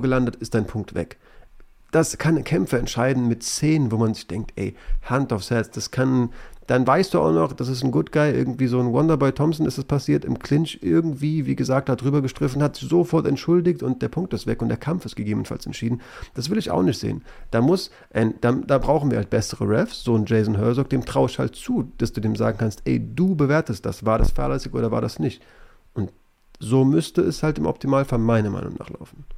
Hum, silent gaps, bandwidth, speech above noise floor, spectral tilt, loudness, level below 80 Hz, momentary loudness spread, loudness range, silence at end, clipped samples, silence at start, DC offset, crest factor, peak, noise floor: none; none; 15.5 kHz; 31 dB; -6.5 dB/octave; -22 LUFS; -36 dBFS; 9 LU; 3 LU; 0 s; under 0.1%; 0 s; under 0.1%; 16 dB; -6 dBFS; -53 dBFS